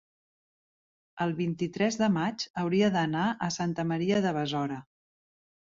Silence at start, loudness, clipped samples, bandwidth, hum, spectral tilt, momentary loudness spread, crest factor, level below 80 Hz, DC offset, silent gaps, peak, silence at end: 1.15 s; -29 LUFS; under 0.1%; 7.6 kHz; none; -5.5 dB/octave; 7 LU; 18 dB; -68 dBFS; under 0.1%; 2.50-2.54 s; -14 dBFS; 0.95 s